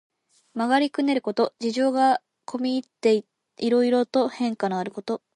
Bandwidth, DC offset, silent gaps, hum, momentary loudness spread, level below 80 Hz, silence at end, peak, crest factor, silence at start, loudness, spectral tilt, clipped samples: 11 kHz; under 0.1%; none; none; 9 LU; -76 dBFS; 0.2 s; -8 dBFS; 16 dB; 0.55 s; -24 LUFS; -5 dB/octave; under 0.1%